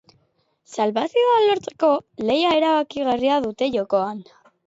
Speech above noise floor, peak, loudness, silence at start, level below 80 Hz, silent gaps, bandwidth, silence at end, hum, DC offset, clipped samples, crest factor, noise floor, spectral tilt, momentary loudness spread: 46 dB; -6 dBFS; -20 LUFS; 0.7 s; -62 dBFS; none; 8 kHz; 0.45 s; none; under 0.1%; under 0.1%; 14 dB; -66 dBFS; -5 dB/octave; 6 LU